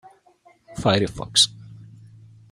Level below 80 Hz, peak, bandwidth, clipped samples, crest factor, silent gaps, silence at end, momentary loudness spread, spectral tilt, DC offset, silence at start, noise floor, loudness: -52 dBFS; -4 dBFS; 16 kHz; under 0.1%; 22 dB; none; 0.7 s; 8 LU; -3 dB/octave; under 0.1%; 0.7 s; -57 dBFS; -20 LUFS